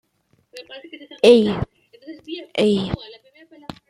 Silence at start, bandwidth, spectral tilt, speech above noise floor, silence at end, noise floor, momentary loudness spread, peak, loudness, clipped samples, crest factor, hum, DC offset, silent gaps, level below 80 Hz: 0.55 s; 12.5 kHz; -6 dB/octave; 46 dB; 0.15 s; -64 dBFS; 27 LU; -2 dBFS; -18 LUFS; under 0.1%; 20 dB; none; under 0.1%; none; -48 dBFS